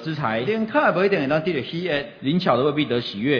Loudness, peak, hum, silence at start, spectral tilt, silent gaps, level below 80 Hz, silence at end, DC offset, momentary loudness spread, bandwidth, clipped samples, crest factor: -22 LUFS; -4 dBFS; none; 0 s; -7.5 dB/octave; none; -58 dBFS; 0 s; under 0.1%; 6 LU; 5.4 kHz; under 0.1%; 18 dB